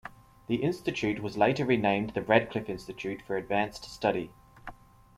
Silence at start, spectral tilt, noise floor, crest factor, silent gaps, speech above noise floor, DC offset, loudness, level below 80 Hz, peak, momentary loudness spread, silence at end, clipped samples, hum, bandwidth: 0.05 s; -6 dB/octave; -48 dBFS; 24 dB; none; 19 dB; under 0.1%; -29 LUFS; -58 dBFS; -6 dBFS; 21 LU; 0.45 s; under 0.1%; none; 15 kHz